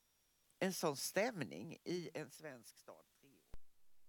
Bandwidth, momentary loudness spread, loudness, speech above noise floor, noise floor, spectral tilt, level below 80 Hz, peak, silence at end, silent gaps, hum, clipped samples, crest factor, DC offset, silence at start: 19 kHz; 21 LU; -43 LUFS; 34 dB; -78 dBFS; -4 dB/octave; -72 dBFS; -24 dBFS; 0 s; none; none; under 0.1%; 22 dB; under 0.1%; 0.6 s